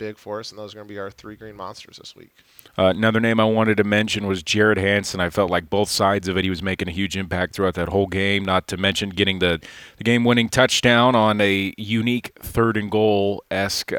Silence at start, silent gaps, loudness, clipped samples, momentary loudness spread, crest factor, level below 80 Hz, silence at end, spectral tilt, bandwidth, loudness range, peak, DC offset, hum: 0 s; none; -20 LUFS; under 0.1%; 18 LU; 20 dB; -50 dBFS; 0 s; -4.5 dB/octave; 18 kHz; 4 LU; 0 dBFS; under 0.1%; none